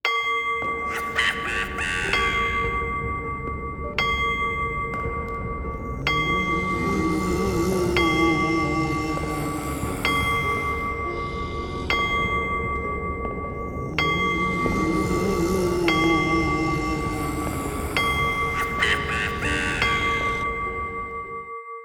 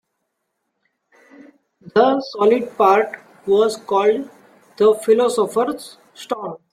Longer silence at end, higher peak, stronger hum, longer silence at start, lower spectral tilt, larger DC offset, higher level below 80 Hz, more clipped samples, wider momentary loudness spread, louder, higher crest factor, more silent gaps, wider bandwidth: second, 0 s vs 0.15 s; second, -6 dBFS vs -2 dBFS; neither; second, 0.05 s vs 1.85 s; about the same, -5 dB/octave vs -4.5 dB/octave; neither; first, -36 dBFS vs -68 dBFS; neither; second, 9 LU vs 15 LU; second, -24 LUFS vs -18 LUFS; about the same, 18 dB vs 18 dB; neither; first, 20 kHz vs 14 kHz